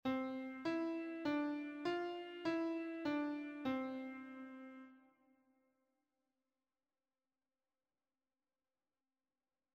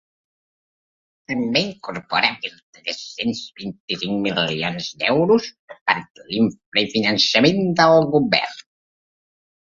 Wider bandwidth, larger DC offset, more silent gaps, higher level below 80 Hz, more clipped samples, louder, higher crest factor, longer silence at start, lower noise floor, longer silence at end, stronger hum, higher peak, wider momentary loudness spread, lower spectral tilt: about the same, 8.2 kHz vs 7.6 kHz; neither; second, none vs 2.63-2.73 s, 3.80-3.88 s, 5.59-5.68 s, 5.81-5.86 s, 6.10-6.15 s, 6.66-6.72 s; second, -84 dBFS vs -60 dBFS; neither; second, -43 LUFS vs -19 LUFS; about the same, 18 dB vs 22 dB; second, 0.05 s vs 1.3 s; about the same, under -90 dBFS vs under -90 dBFS; first, 4.75 s vs 1.15 s; neither; second, -28 dBFS vs 0 dBFS; second, 13 LU vs 16 LU; first, -6 dB/octave vs -4.5 dB/octave